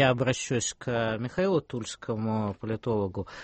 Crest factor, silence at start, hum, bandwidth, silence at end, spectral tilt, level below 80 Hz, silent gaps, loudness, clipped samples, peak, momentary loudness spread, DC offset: 18 dB; 0 s; none; 8.8 kHz; 0 s; -5 dB/octave; -56 dBFS; none; -29 LUFS; under 0.1%; -10 dBFS; 7 LU; under 0.1%